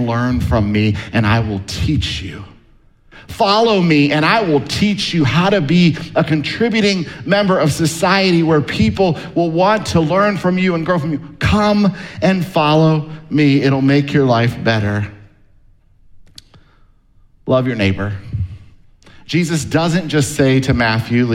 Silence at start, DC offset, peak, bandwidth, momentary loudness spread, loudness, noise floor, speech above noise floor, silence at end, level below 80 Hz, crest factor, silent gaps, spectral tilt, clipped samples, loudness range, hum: 0 s; under 0.1%; 0 dBFS; 15.5 kHz; 8 LU; -15 LUFS; -49 dBFS; 35 dB; 0 s; -36 dBFS; 14 dB; none; -6 dB/octave; under 0.1%; 8 LU; none